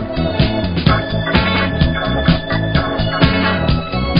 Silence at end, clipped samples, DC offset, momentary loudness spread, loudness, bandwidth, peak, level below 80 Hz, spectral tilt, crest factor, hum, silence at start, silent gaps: 0 s; under 0.1%; under 0.1%; 3 LU; -16 LUFS; 5.4 kHz; 0 dBFS; -24 dBFS; -9 dB/octave; 16 dB; none; 0 s; none